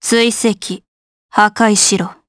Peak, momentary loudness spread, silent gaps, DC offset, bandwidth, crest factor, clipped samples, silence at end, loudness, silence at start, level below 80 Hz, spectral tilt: 0 dBFS; 14 LU; 0.88-1.29 s; under 0.1%; 11 kHz; 14 dB; under 0.1%; 0.15 s; -13 LUFS; 0 s; -56 dBFS; -2.5 dB/octave